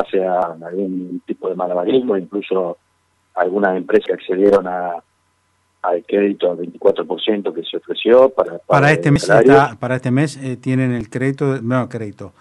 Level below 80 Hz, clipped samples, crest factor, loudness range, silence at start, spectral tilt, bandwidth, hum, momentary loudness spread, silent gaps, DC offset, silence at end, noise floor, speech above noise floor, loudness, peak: -52 dBFS; under 0.1%; 16 dB; 6 LU; 0 s; -6.5 dB/octave; 11.5 kHz; none; 13 LU; none; under 0.1%; 0.1 s; -63 dBFS; 46 dB; -17 LUFS; 0 dBFS